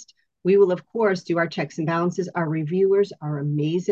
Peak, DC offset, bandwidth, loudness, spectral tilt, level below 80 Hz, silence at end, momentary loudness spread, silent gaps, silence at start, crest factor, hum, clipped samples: -8 dBFS; under 0.1%; 7.6 kHz; -23 LUFS; -7.5 dB/octave; -72 dBFS; 0 s; 8 LU; none; 0 s; 14 dB; none; under 0.1%